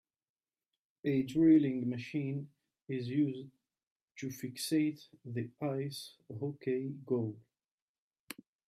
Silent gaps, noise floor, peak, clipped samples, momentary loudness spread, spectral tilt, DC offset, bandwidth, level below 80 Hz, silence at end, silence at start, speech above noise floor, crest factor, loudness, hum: 3.87-4.08 s; under -90 dBFS; -18 dBFS; under 0.1%; 21 LU; -6.5 dB/octave; under 0.1%; 14.5 kHz; -78 dBFS; 1.3 s; 1.05 s; over 56 dB; 18 dB; -35 LUFS; none